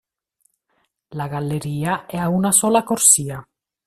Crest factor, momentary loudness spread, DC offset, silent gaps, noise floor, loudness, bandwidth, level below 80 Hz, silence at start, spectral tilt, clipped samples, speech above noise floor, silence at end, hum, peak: 22 dB; 18 LU; under 0.1%; none; -69 dBFS; -17 LUFS; 14.5 kHz; -56 dBFS; 1.1 s; -4 dB/octave; under 0.1%; 50 dB; 0.45 s; none; 0 dBFS